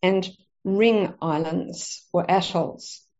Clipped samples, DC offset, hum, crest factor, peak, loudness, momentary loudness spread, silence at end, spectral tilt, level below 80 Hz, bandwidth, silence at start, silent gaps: under 0.1%; under 0.1%; none; 18 dB; -6 dBFS; -24 LUFS; 14 LU; 0.2 s; -4.5 dB/octave; -64 dBFS; 8 kHz; 0.05 s; none